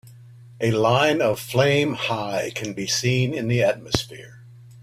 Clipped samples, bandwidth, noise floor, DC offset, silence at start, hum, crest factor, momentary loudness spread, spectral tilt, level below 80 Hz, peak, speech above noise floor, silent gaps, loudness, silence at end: under 0.1%; 15.5 kHz; -45 dBFS; under 0.1%; 0.05 s; none; 22 dB; 9 LU; -4.5 dB/octave; -52 dBFS; 0 dBFS; 23 dB; none; -22 LUFS; 0 s